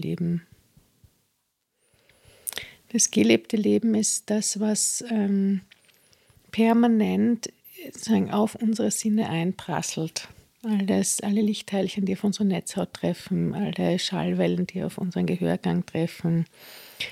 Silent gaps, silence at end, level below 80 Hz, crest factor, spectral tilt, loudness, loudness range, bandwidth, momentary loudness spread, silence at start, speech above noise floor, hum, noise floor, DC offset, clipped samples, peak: none; 0 s; -64 dBFS; 22 dB; -4.5 dB/octave; -25 LUFS; 3 LU; 15.5 kHz; 12 LU; 0 s; 51 dB; none; -75 dBFS; under 0.1%; under 0.1%; -4 dBFS